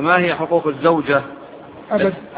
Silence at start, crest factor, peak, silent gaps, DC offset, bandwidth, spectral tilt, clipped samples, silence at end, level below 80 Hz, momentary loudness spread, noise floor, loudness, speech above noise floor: 0 s; 18 dB; 0 dBFS; none; under 0.1%; 5 kHz; -9.5 dB/octave; under 0.1%; 0 s; -56 dBFS; 21 LU; -37 dBFS; -18 LUFS; 20 dB